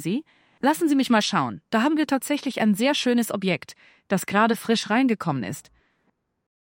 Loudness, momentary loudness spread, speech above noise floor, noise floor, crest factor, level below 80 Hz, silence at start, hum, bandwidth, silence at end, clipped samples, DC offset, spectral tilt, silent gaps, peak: -23 LUFS; 9 LU; 48 dB; -71 dBFS; 18 dB; -70 dBFS; 0 s; none; 17 kHz; 1 s; under 0.1%; under 0.1%; -4.5 dB/octave; none; -6 dBFS